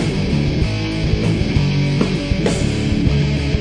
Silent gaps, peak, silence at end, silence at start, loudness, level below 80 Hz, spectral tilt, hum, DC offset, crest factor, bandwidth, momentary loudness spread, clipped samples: none; -2 dBFS; 0 s; 0 s; -18 LUFS; -26 dBFS; -6.5 dB/octave; none; under 0.1%; 14 dB; 10.5 kHz; 2 LU; under 0.1%